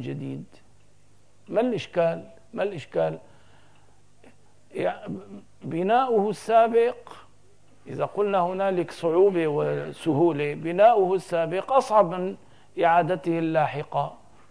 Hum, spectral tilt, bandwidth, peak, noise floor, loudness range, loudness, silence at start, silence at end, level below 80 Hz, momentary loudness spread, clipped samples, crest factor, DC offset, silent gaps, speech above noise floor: 50 Hz at -60 dBFS; -7 dB/octave; 11 kHz; -8 dBFS; -60 dBFS; 8 LU; -24 LUFS; 0 s; 0.35 s; -68 dBFS; 17 LU; under 0.1%; 18 dB; 0.3%; none; 37 dB